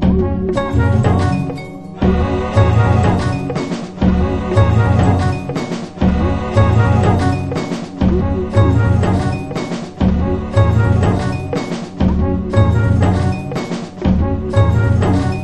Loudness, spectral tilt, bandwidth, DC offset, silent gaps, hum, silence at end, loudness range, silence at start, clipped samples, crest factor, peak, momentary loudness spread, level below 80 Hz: -16 LUFS; -8 dB/octave; 9.4 kHz; under 0.1%; none; none; 0 s; 2 LU; 0 s; under 0.1%; 14 dB; 0 dBFS; 9 LU; -24 dBFS